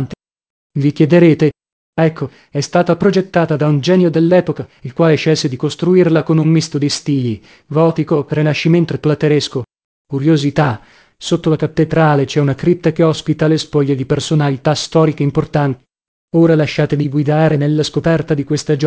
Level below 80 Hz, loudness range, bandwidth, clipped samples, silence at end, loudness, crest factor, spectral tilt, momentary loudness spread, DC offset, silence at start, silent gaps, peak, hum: -46 dBFS; 2 LU; 8 kHz; under 0.1%; 0 s; -14 LUFS; 14 dB; -6.5 dB/octave; 9 LU; under 0.1%; 0 s; 0.50-0.70 s, 1.72-1.93 s, 9.84-10.05 s, 16.08-16.28 s; 0 dBFS; none